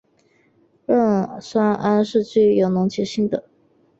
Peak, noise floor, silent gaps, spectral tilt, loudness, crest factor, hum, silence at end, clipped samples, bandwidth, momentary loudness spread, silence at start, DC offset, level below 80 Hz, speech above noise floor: -6 dBFS; -60 dBFS; none; -7 dB/octave; -19 LUFS; 16 dB; none; 0.6 s; under 0.1%; 7.8 kHz; 7 LU; 0.9 s; under 0.1%; -60 dBFS; 42 dB